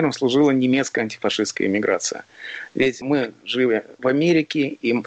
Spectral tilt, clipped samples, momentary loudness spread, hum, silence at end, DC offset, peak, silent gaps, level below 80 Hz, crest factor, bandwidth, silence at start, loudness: -4.5 dB/octave; under 0.1%; 9 LU; none; 0.05 s; under 0.1%; -8 dBFS; none; -62 dBFS; 12 dB; 8.8 kHz; 0 s; -21 LUFS